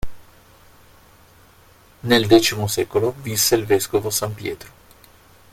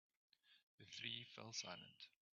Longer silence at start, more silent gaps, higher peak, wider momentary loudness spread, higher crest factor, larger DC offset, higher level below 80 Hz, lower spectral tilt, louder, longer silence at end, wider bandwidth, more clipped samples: second, 0.05 s vs 0.45 s; second, none vs 0.63-0.78 s; first, 0 dBFS vs -32 dBFS; first, 16 LU vs 13 LU; about the same, 22 dB vs 24 dB; neither; first, -46 dBFS vs under -90 dBFS; first, -4 dB/octave vs -1 dB/octave; first, -19 LUFS vs -52 LUFS; first, 0.85 s vs 0.25 s; first, 16.5 kHz vs 7.4 kHz; neither